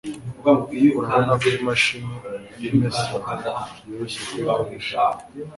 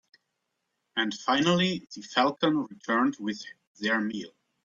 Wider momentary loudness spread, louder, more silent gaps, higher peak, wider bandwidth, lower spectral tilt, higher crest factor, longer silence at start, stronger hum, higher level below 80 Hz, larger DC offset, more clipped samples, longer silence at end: about the same, 14 LU vs 13 LU; first, -22 LUFS vs -28 LUFS; second, none vs 3.67-3.75 s; first, -4 dBFS vs -10 dBFS; first, 11.5 kHz vs 7.6 kHz; about the same, -5.5 dB/octave vs -4.5 dB/octave; about the same, 18 dB vs 20 dB; second, 0.05 s vs 0.95 s; neither; first, -54 dBFS vs -70 dBFS; neither; neither; second, 0 s vs 0.35 s